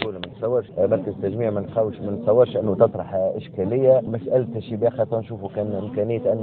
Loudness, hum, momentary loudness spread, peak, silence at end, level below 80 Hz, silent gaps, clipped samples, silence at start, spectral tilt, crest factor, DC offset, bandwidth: -22 LUFS; none; 9 LU; -2 dBFS; 0 s; -58 dBFS; none; under 0.1%; 0 s; -11.5 dB/octave; 18 dB; under 0.1%; 4.4 kHz